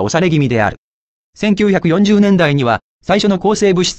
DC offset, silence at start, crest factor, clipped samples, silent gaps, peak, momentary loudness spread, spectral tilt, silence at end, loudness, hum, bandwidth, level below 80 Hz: under 0.1%; 0 s; 12 dB; under 0.1%; 0.78-1.33 s, 2.82-3.00 s; 0 dBFS; 6 LU; -5.5 dB/octave; 0 s; -13 LUFS; none; 8.6 kHz; -42 dBFS